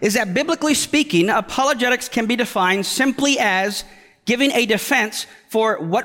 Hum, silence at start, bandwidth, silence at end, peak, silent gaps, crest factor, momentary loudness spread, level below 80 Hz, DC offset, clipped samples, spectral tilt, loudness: none; 0 s; 17 kHz; 0 s; -4 dBFS; none; 14 dB; 7 LU; -56 dBFS; under 0.1%; under 0.1%; -3 dB/octave; -18 LUFS